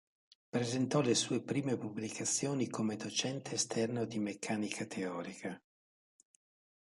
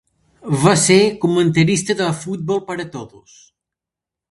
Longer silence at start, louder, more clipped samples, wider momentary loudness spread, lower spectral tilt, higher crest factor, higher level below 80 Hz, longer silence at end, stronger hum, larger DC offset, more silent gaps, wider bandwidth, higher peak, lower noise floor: about the same, 0.55 s vs 0.45 s; second, -36 LUFS vs -16 LUFS; neither; second, 9 LU vs 15 LU; about the same, -4 dB/octave vs -4.5 dB/octave; about the same, 20 dB vs 18 dB; second, -78 dBFS vs -54 dBFS; about the same, 1.25 s vs 1.25 s; neither; neither; neither; about the same, 11.5 kHz vs 11.5 kHz; second, -18 dBFS vs 0 dBFS; first, under -90 dBFS vs -86 dBFS